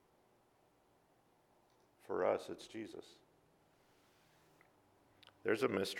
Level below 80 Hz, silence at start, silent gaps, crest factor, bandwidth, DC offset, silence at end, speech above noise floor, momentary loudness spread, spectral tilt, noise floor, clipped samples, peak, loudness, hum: -84 dBFS; 2.1 s; none; 24 dB; 16.5 kHz; under 0.1%; 0 s; 34 dB; 14 LU; -4.5 dB/octave; -73 dBFS; under 0.1%; -20 dBFS; -40 LUFS; none